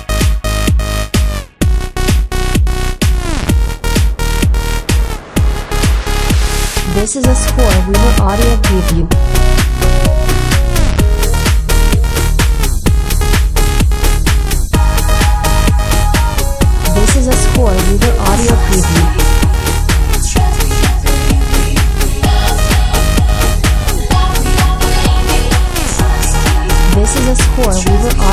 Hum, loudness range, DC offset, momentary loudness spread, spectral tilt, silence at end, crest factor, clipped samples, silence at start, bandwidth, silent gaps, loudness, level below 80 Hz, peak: none; 3 LU; under 0.1%; 4 LU; -4.5 dB/octave; 0 s; 10 dB; under 0.1%; 0 s; 16 kHz; none; -13 LUFS; -12 dBFS; 0 dBFS